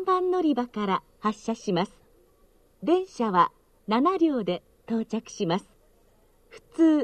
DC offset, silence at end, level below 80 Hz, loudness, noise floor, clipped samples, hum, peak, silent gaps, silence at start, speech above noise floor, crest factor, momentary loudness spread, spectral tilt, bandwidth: under 0.1%; 0 s; -62 dBFS; -27 LUFS; -61 dBFS; under 0.1%; none; -8 dBFS; none; 0 s; 36 dB; 18 dB; 10 LU; -6 dB/octave; 9.2 kHz